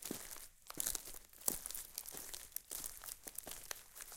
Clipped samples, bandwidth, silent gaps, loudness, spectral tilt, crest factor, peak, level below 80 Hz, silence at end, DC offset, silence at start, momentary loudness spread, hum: under 0.1%; 17 kHz; none; -45 LUFS; -0.5 dB/octave; 34 dB; -14 dBFS; -64 dBFS; 0 s; under 0.1%; 0 s; 10 LU; none